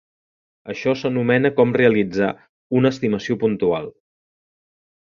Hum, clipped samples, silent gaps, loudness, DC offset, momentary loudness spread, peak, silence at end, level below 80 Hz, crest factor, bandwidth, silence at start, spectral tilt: none; under 0.1%; 2.49-2.70 s; -19 LUFS; under 0.1%; 10 LU; -2 dBFS; 1.15 s; -56 dBFS; 18 dB; 7.2 kHz; 0.65 s; -7.5 dB/octave